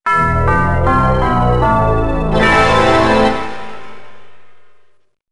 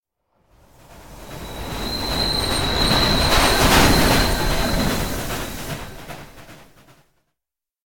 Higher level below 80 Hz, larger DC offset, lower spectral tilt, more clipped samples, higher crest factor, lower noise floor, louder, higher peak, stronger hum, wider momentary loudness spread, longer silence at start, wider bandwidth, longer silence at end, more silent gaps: about the same, -24 dBFS vs -28 dBFS; first, 4% vs 0.9%; first, -6.5 dB/octave vs -3.5 dB/octave; neither; second, 14 dB vs 20 dB; second, -50 dBFS vs -87 dBFS; first, -13 LUFS vs -18 LUFS; about the same, 0 dBFS vs 0 dBFS; neither; second, 13 LU vs 21 LU; about the same, 0 s vs 0 s; second, 11.5 kHz vs 17.5 kHz; about the same, 0 s vs 0.05 s; neither